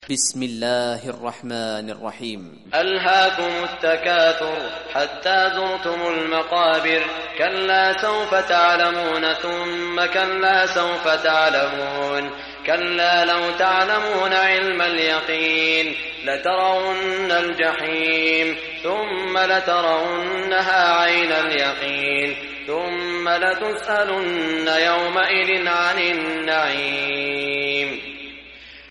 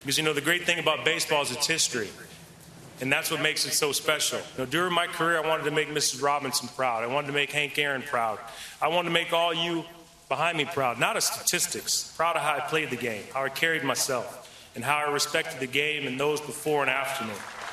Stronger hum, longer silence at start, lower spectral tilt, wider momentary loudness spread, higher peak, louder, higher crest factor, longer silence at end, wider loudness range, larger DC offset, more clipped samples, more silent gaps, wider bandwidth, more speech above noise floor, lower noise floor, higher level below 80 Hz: neither; about the same, 0 s vs 0 s; about the same, -2 dB/octave vs -2 dB/octave; about the same, 9 LU vs 9 LU; about the same, -6 dBFS vs -6 dBFS; first, -19 LUFS vs -26 LUFS; second, 16 dB vs 22 dB; about the same, 0 s vs 0 s; about the same, 2 LU vs 2 LU; neither; neither; neither; second, 11.5 kHz vs 14.5 kHz; about the same, 22 dB vs 21 dB; second, -42 dBFS vs -48 dBFS; first, -56 dBFS vs -66 dBFS